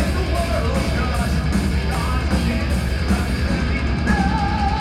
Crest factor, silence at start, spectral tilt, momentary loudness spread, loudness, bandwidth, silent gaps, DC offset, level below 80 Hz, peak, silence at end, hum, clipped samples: 14 dB; 0 s; -6 dB/octave; 2 LU; -21 LUFS; 13.5 kHz; none; under 0.1%; -22 dBFS; -6 dBFS; 0 s; none; under 0.1%